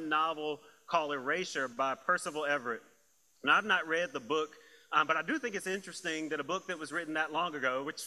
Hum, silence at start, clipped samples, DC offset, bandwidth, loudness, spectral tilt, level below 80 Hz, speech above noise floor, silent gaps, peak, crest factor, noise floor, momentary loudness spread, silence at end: none; 0 s; under 0.1%; under 0.1%; 15 kHz; -33 LUFS; -3 dB/octave; -80 dBFS; 36 dB; none; -12 dBFS; 22 dB; -70 dBFS; 9 LU; 0 s